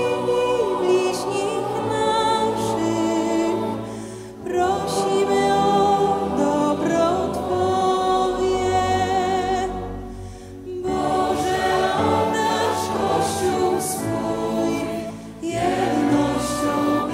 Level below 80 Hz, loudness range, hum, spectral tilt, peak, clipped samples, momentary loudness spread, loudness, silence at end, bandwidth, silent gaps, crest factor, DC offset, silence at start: -46 dBFS; 3 LU; none; -5 dB/octave; -6 dBFS; under 0.1%; 9 LU; -21 LUFS; 0 s; 16 kHz; none; 14 dB; under 0.1%; 0 s